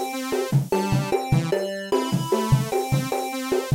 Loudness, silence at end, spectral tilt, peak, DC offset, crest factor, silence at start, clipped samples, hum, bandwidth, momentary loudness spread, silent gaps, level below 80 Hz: -24 LUFS; 0 s; -6 dB/octave; -6 dBFS; under 0.1%; 16 dB; 0 s; under 0.1%; none; 16 kHz; 4 LU; none; -46 dBFS